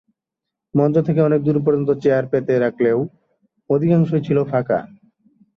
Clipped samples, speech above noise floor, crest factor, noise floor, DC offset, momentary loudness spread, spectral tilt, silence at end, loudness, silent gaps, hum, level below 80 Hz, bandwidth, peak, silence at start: under 0.1%; 66 dB; 16 dB; -83 dBFS; under 0.1%; 6 LU; -10.5 dB/octave; 0.7 s; -18 LUFS; none; none; -58 dBFS; 6.4 kHz; -4 dBFS; 0.75 s